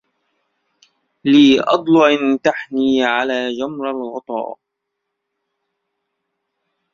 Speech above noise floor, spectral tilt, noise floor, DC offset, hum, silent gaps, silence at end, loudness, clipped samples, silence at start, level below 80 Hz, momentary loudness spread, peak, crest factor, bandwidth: 62 dB; -5 dB/octave; -77 dBFS; under 0.1%; none; none; 2.4 s; -16 LUFS; under 0.1%; 1.25 s; -60 dBFS; 14 LU; -2 dBFS; 18 dB; 7.2 kHz